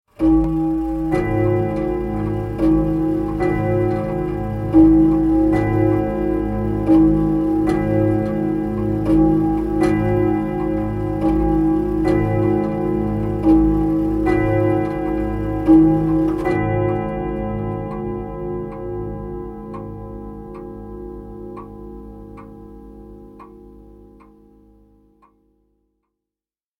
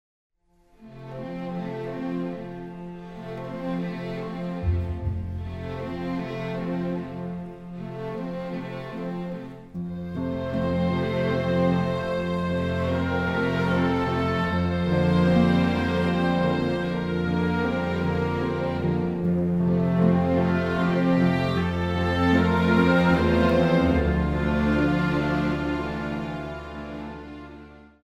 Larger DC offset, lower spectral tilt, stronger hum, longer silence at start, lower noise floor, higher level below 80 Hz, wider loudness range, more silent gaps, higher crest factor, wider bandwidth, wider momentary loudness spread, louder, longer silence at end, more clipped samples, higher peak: neither; first, -10 dB/octave vs -8 dB/octave; neither; second, 0.2 s vs 0.8 s; first, under -90 dBFS vs -60 dBFS; first, -32 dBFS vs -40 dBFS; first, 17 LU vs 11 LU; neither; about the same, 18 dB vs 20 dB; second, 5.2 kHz vs 7.8 kHz; first, 19 LU vs 15 LU; first, -18 LUFS vs -25 LUFS; first, 2.85 s vs 0.2 s; neither; first, -2 dBFS vs -6 dBFS